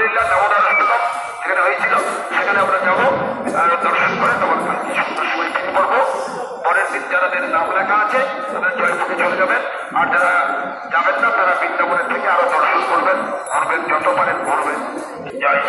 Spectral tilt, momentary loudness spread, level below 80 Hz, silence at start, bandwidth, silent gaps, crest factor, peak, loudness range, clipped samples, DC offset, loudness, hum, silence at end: -3.5 dB/octave; 6 LU; -62 dBFS; 0 s; 11.5 kHz; none; 16 dB; -2 dBFS; 2 LU; under 0.1%; under 0.1%; -16 LUFS; none; 0 s